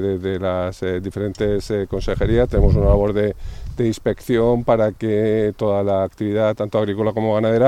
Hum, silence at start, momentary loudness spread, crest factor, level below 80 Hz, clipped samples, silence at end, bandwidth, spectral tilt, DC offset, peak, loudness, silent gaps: none; 0 s; 7 LU; 18 dB; -28 dBFS; under 0.1%; 0 s; 13.5 kHz; -8 dB/octave; under 0.1%; 0 dBFS; -20 LUFS; none